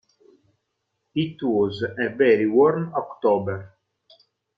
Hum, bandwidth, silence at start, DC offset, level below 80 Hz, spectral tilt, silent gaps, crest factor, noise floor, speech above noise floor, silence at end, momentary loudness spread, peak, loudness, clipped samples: none; 5.2 kHz; 1.15 s; under 0.1%; -66 dBFS; -9 dB/octave; none; 16 dB; -77 dBFS; 56 dB; 0.9 s; 12 LU; -6 dBFS; -22 LUFS; under 0.1%